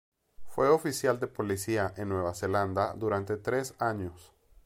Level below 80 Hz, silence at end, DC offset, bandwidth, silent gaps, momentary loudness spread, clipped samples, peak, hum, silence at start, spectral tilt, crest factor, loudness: -60 dBFS; 0.4 s; under 0.1%; 16.5 kHz; none; 7 LU; under 0.1%; -12 dBFS; none; 0.4 s; -5.5 dB/octave; 20 dB; -30 LUFS